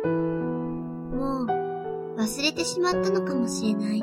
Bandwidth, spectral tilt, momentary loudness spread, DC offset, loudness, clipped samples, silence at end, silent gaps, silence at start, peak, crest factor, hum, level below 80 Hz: 16 kHz; -5 dB/octave; 8 LU; under 0.1%; -27 LUFS; under 0.1%; 0 s; none; 0 s; -10 dBFS; 16 dB; none; -50 dBFS